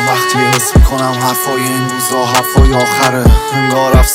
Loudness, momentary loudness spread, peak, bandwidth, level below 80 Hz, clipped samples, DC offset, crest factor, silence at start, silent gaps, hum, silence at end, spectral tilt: -11 LUFS; 4 LU; 0 dBFS; 17.5 kHz; -14 dBFS; under 0.1%; under 0.1%; 10 dB; 0 s; none; none; 0 s; -4.5 dB/octave